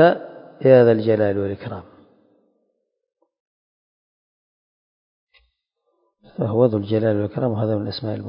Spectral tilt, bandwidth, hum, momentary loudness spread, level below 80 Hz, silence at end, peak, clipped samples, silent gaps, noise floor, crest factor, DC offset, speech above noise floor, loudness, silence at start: -12 dB/octave; 5.4 kHz; none; 19 LU; -54 dBFS; 0 s; -2 dBFS; under 0.1%; 3.40-5.27 s; -73 dBFS; 20 dB; under 0.1%; 55 dB; -19 LUFS; 0 s